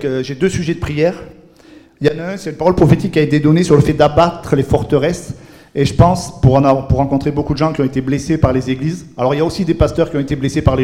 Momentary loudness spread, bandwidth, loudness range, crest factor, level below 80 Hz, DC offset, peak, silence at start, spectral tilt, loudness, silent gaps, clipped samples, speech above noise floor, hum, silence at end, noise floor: 8 LU; 13.5 kHz; 3 LU; 14 dB; -30 dBFS; under 0.1%; 0 dBFS; 0 s; -7 dB/octave; -15 LUFS; none; 0.4%; 29 dB; none; 0 s; -43 dBFS